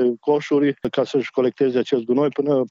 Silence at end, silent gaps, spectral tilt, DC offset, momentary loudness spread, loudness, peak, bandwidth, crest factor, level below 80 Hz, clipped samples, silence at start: 0.05 s; none; -7 dB/octave; under 0.1%; 2 LU; -20 LUFS; -6 dBFS; 7.6 kHz; 12 dB; -62 dBFS; under 0.1%; 0 s